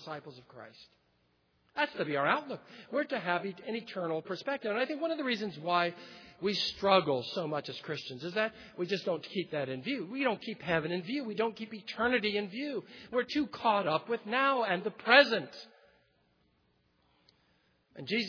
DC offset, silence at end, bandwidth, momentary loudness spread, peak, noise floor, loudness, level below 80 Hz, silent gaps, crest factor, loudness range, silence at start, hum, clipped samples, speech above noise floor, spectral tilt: under 0.1%; 0 s; 5.4 kHz; 15 LU; -6 dBFS; -73 dBFS; -32 LUFS; -72 dBFS; none; 26 dB; 6 LU; 0 s; none; under 0.1%; 40 dB; -5.5 dB/octave